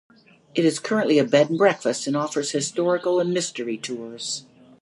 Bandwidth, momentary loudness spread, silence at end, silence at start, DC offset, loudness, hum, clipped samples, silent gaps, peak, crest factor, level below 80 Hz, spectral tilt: 11.5 kHz; 11 LU; 0.4 s; 0.55 s; under 0.1%; -23 LUFS; none; under 0.1%; none; -4 dBFS; 18 dB; -76 dBFS; -4 dB/octave